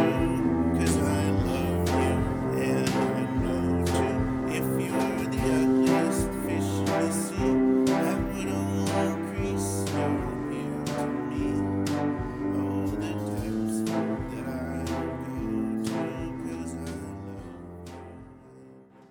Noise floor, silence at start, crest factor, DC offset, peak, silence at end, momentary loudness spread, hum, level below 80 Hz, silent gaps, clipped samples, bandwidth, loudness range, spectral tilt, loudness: -51 dBFS; 0 s; 16 dB; under 0.1%; -12 dBFS; 0.25 s; 10 LU; none; -42 dBFS; none; under 0.1%; 19 kHz; 7 LU; -6 dB/octave; -28 LUFS